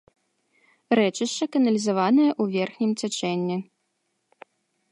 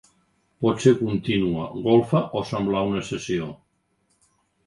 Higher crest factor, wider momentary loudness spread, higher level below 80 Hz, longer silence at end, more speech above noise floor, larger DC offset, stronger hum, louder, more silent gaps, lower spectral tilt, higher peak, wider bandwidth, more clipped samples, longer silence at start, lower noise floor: about the same, 18 dB vs 20 dB; about the same, 7 LU vs 9 LU; second, -76 dBFS vs -54 dBFS; first, 1.3 s vs 1.1 s; first, 52 dB vs 47 dB; neither; neither; about the same, -23 LUFS vs -23 LUFS; neither; second, -5 dB/octave vs -6.5 dB/octave; second, -8 dBFS vs -4 dBFS; about the same, 11.5 kHz vs 11.5 kHz; neither; first, 0.9 s vs 0.6 s; first, -75 dBFS vs -69 dBFS